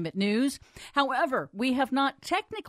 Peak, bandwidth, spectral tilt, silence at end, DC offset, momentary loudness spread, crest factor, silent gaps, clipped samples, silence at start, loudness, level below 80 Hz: -12 dBFS; 15 kHz; -4.5 dB/octave; 0 s; under 0.1%; 5 LU; 18 dB; none; under 0.1%; 0 s; -28 LUFS; -64 dBFS